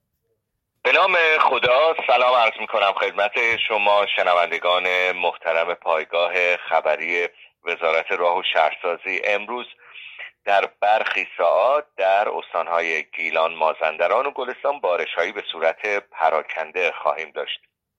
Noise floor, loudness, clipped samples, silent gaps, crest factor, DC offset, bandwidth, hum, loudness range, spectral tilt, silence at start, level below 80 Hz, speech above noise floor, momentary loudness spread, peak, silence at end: -76 dBFS; -20 LUFS; under 0.1%; none; 18 dB; under 0.1%; 8.2 kHz; none; 5 LU; -2.5 dB/octave; 0.85 s; -70 dBFS; 55 dB; 10 LU; -2 dBFS; 0.45 s